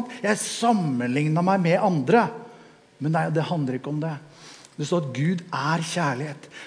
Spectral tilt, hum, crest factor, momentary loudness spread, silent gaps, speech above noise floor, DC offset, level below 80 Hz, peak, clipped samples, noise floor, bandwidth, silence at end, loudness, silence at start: -6 dB/octave; none; 18 dB; 13 LU; none; 27 dB; under 0.1%; -74 dBFS; -6 dBFS; under 0.1%; -50 dBFS; 10.5 kHz; 0 s; -24 LUFS; 0 s